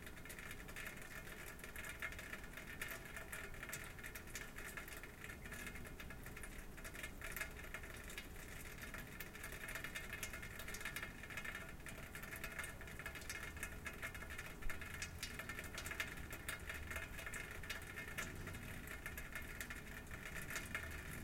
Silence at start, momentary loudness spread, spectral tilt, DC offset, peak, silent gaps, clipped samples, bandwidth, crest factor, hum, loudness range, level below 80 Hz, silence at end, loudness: 0 s; 5 LU; -3 dB/octave; under 0.1%; -26 dBFS; none; under 0.1%; 17 kHz; 22 dB; none; 3 LU; -56 dBFS; 0 s; -49 LUFS